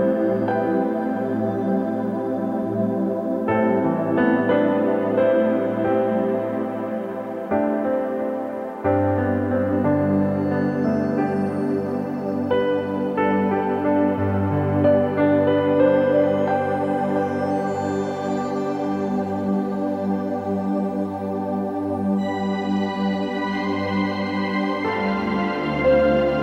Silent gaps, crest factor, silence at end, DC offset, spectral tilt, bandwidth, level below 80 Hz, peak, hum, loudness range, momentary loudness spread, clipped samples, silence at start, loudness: none; 14 dB; 0 s; under 0.1%; -8.5 dB/octave; 8.8 kHz; -54 dBFS; -6 dBFS; none; 5 LU; 7 LU; under 0.1%; 0 s; -22 LUFS